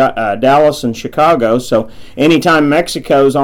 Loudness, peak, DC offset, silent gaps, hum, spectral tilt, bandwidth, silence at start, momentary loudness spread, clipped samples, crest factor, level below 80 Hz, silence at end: -11 LUFS; -2 dBFS; under 0.1%; none; none; -5.5 dB/octave; 17 kHz; 0 s; 7 LU; under 0.1%; 8 dB; -40 dBFS; 0 s